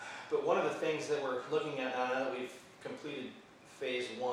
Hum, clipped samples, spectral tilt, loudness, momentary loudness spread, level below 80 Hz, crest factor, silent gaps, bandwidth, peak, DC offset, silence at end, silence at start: none; under 0.1%; -4 dB/octave; -36 LUFS; 15 LU; -82 dBFS; 20 dB; none; 14 kHz; -18 dBFS; under 0.1%; 0 s; 0 s